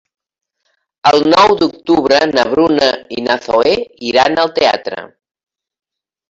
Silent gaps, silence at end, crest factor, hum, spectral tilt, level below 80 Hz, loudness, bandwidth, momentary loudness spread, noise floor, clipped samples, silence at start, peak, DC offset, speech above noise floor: none; 1.2 s; 14 dB; none; -4 dB/octave; -50 dBFS; -12 LUFS; 7.8 kHz; 9 LU; -66 dBFS; under 0.1%; 1.05 s; 0 dBFS; under 0.1%; 54 dB